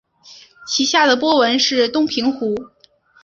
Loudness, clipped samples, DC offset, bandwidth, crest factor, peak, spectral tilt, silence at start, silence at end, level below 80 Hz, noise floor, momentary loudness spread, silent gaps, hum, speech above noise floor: -16 LUFS; under 0.1%; under 0.1%; 7.8 kHz; 16 dB; -2 dBFS; -2 dB/octave; 0.25 s; 0.55 s; -60 dBFS; -53 dBFS; 10 LU; none; none; 37 dB